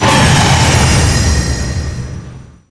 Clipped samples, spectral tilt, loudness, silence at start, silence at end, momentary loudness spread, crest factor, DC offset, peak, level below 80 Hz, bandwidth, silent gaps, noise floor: 0.1%; -4 dB/octave; -11 LUFS; 0 s; 0.2 s; 16 LU; 12 dB; under 0.1%; 0 dBFS; -20 dBFS; 11 kHz; none; -32 dBFS